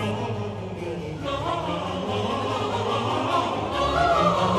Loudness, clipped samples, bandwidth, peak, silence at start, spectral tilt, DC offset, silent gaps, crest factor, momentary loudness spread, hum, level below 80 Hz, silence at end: -25 LUFS; under 0.1%; 13.5 kHz; -8 dBFS; 0 s; -5.5 dB/octave; under 0.1%; none; 16 dB; 11 LU; none; -44 dBFS; 0 s